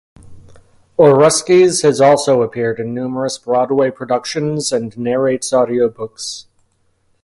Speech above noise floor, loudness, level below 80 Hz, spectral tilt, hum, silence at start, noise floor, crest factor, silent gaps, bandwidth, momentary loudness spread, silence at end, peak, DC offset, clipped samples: 46 dB; -14 LUFS; -54 dBFS; -4.5 dB/octave; none; 0.25 s; -60 dBFS; 16 dB; none; 11.5 kHz; 12 LU; 0.8 s; 0 dBFS; under 0.1%; under 0.1%